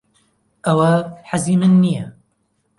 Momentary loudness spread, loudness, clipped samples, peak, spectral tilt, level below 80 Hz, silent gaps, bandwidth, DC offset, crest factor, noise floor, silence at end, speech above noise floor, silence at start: 12 LU; -17 LUFS; under 0.1%; -2 dBFS; -7 dB/octave; -56 dBFS; none; 11.5 kHz; under 0.1%; 16 dB; -66 dBFS; 0.7 s; 51 dB; 0.65 s